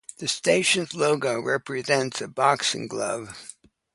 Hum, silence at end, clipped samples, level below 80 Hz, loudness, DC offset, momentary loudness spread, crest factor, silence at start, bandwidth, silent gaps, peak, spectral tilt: none; 0.45 s; under 0.1%; -68 dBFS; -24 LUFS; under 0.1%; 11 LU; 20 dB; 0.2 s; 11.5 kHz; none; -4 dBFS; -3 dB/octave